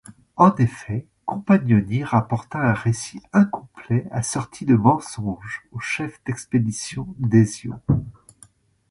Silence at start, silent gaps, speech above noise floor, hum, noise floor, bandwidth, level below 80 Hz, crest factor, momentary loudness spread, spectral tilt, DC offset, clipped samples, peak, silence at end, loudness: 0.1 s; none; 33 dB; none; -54 dBFS; 11.5 kHz; -48 dBFS; 20 dB; 13 LU; -6.5 dB/octave; under 0.1%; under 0.1%; -2 dBFS; 0.8 s; -22 LUFS